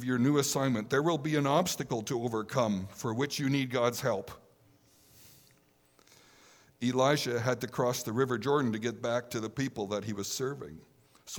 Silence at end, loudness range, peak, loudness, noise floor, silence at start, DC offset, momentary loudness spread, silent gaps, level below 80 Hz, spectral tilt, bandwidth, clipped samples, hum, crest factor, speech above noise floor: 0 s; 5 LU; -12 dBFS; -31 LUFS; -66 dBFS; 0 s; under 0.1%; 8 LU; none; -70 dBFS; -5 dB/octave; over 20 kHz; under 0.1%; none; 20 dB; 35 dB